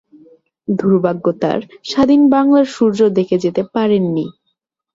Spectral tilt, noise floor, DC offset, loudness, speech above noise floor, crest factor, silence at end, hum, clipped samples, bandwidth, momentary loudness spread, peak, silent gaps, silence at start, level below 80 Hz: -7.5 dB/octave; -71 dBFS; under 0.1%; -15 LUFS; 57 dB; 14 dB; 0.65 s; none; under 0.1%; 7.8 kHz; 11 LU; -2 dBFS; none; 0.7 s; -54 dBFS